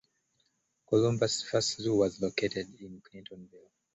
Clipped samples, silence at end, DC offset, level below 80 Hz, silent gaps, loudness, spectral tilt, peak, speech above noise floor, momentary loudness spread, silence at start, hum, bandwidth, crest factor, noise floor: under 0.1%; 0.4 s; under 0.1%; -64 dBFS; none; -30 LUFS; -4.5 dB/octave; -12 dBFS; 45 dB; 21 LU; 0.9 s; none; 8.2 kHz; 20 dB; -76 dBFS